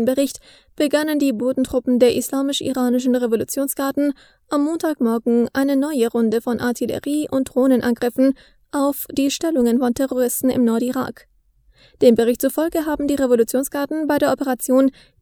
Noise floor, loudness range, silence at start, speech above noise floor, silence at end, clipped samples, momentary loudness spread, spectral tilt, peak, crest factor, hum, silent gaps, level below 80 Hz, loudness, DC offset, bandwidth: -56 dBFS; 1 LU; 0 s; 38 dB; 0.3 s; under 0.1%; 6 LU; -4.5 dB/octave; 0 dBFS; 18 dB; none; none; -52 dBFS; -19 LUFS; under 0.1%; over 20 kHz